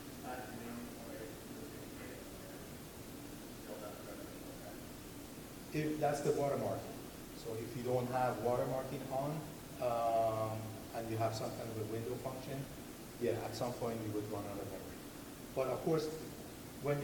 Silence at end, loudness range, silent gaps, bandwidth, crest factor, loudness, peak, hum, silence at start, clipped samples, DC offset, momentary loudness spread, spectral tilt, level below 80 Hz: 0 s; 11 LU; none; 19.5 kHz; 18 dB; -41 LUFS; -22 dBFS; none; 0 s; under 0.1%; under 0.1%; 14 LU; -5.5 dB/octave; -62 dBFS